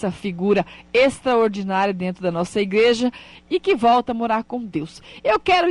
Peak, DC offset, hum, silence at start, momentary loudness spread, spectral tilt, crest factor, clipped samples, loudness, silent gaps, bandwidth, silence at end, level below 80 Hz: -6 dBFS; under 0.1%; none; 0 s; 9 LU; -5.5 dB/octave; 14 dB; under 0.1%; -20 LUFS; none; 11.5 kHz; 0 s; -52 dBFS